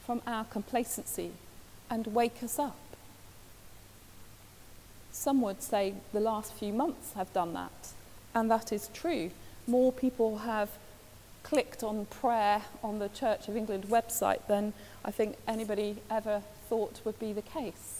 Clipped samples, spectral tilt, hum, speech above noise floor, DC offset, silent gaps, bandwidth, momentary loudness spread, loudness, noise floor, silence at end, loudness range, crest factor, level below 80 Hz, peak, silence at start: under 0.1%; -4.5 dB/octave; none; 21 dB; under 0.1%; none; 16 kHz; 19 LU; -33 LUFS; -54 dBFS; 0 s; 6 LU; 20 dB; -60 dBFS; -14 dBFS; 0 s